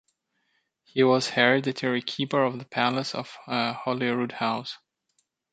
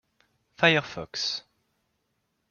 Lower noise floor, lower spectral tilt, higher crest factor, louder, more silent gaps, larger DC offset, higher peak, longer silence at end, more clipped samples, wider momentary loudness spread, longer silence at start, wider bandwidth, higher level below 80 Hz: about the same, -74 dBFS vs -76 dBFS; about the same, -5 dB/octave vs -4 dB/octave; about the same, 24 dB vs 26 dB; about the same, -26 LUFS vs -25 LUFS; neither; neither; about the same, -4 dBFS vs -4 dBFS; second, 0.75 s vs 1.1 s; neither; about the same, 12 LU vs 14 LU; first, 0.95 s vs 0.6 s; first, 9.2 kHz vs 7.2 kHz; second, -74 dBFS vs -66 dBFS